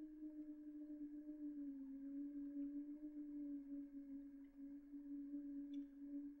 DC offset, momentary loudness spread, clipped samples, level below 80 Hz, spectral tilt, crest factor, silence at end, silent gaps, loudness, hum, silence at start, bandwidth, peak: under 0.1%; 6 LU; under 0.1%; -78 dBFS; -7.5 dB/octave; 10 dB; 0 s; none; -53 LUFS; none; 0 s; 3.7 kHz; -42 dBFS